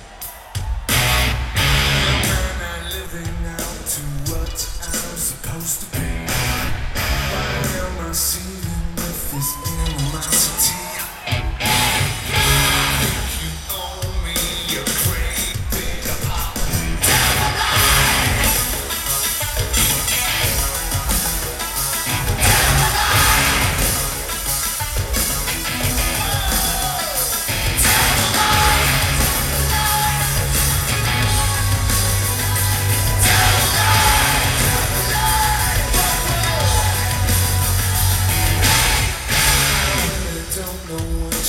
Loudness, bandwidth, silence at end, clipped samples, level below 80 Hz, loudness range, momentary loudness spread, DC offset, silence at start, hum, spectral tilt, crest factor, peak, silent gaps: -17 LUFS; 18 kHz; 0 s; under 0.1%; -26 dBFS; 7 LU; 11 LU; under 0.1%; 0 s; none; -2.5 dB/octave; 18 dB; 0 dBFS; none